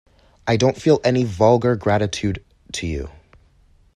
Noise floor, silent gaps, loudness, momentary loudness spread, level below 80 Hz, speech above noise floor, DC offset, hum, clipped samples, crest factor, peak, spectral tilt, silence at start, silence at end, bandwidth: -55 dBFS; none; -19 LUFS; 14 LU; -42 dBFS; 36 dB; under 0.1%; none; under 0.1%; 18 dB; -2 dBFS; -6 dB/octave; 0.45 s; 0.85 s; 11.5 kHz